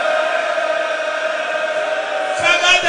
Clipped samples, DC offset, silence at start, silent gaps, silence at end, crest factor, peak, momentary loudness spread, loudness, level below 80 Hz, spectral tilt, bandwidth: under 0.1%; under 0.1%; 0 s; none; 0 s; 16 dB; 0 dBFS; 7 LU; -17 LUFS; -58 dBFS; -0.5 dB/octave; 10.5 kHz